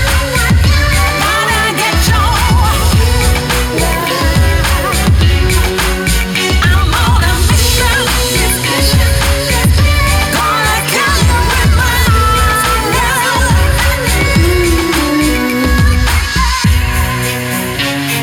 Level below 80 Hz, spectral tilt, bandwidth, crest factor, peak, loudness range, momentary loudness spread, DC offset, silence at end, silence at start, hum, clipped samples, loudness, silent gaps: -14 dBFS; -4 dB/octave; 19.5 kHz; 10 dB; 0 dBFS; 1 LU; 3 LU; under 0.1%; 0 s; 0 s; none; under 0.1%; -11 LUFS; none